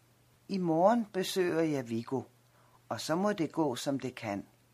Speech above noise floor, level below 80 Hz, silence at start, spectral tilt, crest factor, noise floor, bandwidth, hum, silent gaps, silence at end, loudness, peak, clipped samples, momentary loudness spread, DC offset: 32 dB; -76 dBFS; 0.5 s; -5.5 dB/octave; 20 dB; -64 dBFS; 15.5 kHz; none; none; 0.3 s; -32 LUFS; -12 dBFS; under 0.1%; 12 LU; under 0.1%